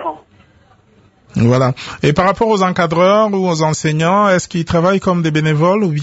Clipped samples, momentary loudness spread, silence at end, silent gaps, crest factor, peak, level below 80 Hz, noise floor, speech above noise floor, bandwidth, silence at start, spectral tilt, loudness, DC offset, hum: under 0.1%; 5 LU; 0 s; none; 14 dB; 0 dBFS; -42 dBFS; -50 dBFS; 37 dB; 8 kHz; 0 s; -6 dB/octave; -14 LUFS; under 0.1%; none